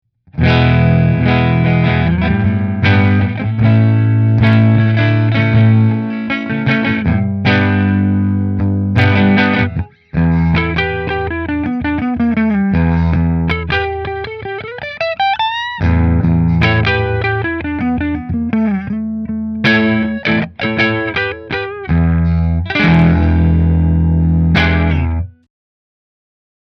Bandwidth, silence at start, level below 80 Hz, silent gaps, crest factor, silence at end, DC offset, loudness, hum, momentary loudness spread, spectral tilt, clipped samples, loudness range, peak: 6.2 kHz; 0.35 s; -26 dBFS; none; 14 dB; 1.5 s; under 0.1%; -14 LUFS; none; 8 LU; -8.5 dB/octave; under 0.1%; 4 LU; 0 dBFS